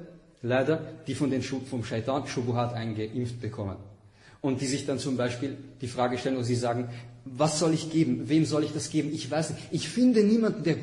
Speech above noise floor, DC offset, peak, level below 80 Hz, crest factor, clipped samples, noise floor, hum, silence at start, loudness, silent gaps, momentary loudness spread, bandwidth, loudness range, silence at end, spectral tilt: 26 dB; under 0.1%; -12 dBFS; -62 dBFS; 18 dB; under 0.1%; -54 dBFS; none; 0 s; -28 LUFS; none; 12 LU; 11 kHz; 6 LU; 0 s; -6 dB/octave